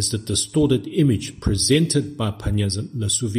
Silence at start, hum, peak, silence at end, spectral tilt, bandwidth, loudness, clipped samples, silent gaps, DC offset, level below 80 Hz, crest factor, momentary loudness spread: 0 s; none; -4 dBFS; 0 s; -4.5 dB/octave; 15.5 kHz; -21 LUFS; under 0.1%; none; under 0.1%; -38 dBFS; 16 dB; 7 LU